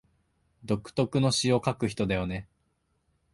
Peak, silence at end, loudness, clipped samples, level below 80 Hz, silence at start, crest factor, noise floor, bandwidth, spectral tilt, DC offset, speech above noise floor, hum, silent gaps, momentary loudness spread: -10 dBFS; 0.9 s; -28 LUFS; under 0.1%; -52 dBFS; 0.65 s; 20 dB; -74 dBFS; 11.5 kHz; -5 dB/octave; under 0.1%; 46 dB; none; none; 8 LU